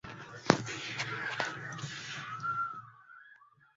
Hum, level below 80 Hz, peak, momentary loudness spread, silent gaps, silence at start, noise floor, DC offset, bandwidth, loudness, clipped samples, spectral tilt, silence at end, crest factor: none; -70 dBFS; -2 dBFS; 23 LU; none; 0.05 s; -61 dBFS; under 0.1%; 7.6 kHz; -35 LUFS; under 0.1%; -3 dB/octave; 0.3 s; 36 dB